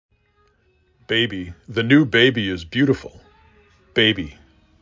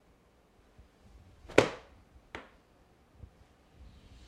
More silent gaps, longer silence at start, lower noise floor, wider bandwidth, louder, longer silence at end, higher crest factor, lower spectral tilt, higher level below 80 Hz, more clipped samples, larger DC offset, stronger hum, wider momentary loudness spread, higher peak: neither; second, 1.1 s vs 1.5 s; second, -61 dBFS vs -65 dBFS; second, 7.6 kHz vs 15.5 kHz; first, -19 LUFS vs -29 LUFS; second, 0.5 s vs 1.85 s; second, 18 dB vs 36 dB; first, -6 dB/octave vs -4.5 dB/octave; first, -48 dBFS vs -60 dBFS; neither; neither; neither; second, 12 LU vs 29 LU; about the same, -2 dBFS vs -4 dBFS